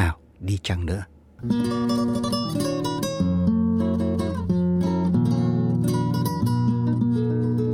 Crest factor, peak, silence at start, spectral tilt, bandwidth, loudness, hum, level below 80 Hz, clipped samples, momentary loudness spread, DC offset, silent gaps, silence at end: 16 dB; -6 dBFS; 0 s; -7 dB/octave; 16.5 kHz; -23 LUFS; none; -42 dBFS; under 0.1%; 6 LU; under 0.1%; none; 0 s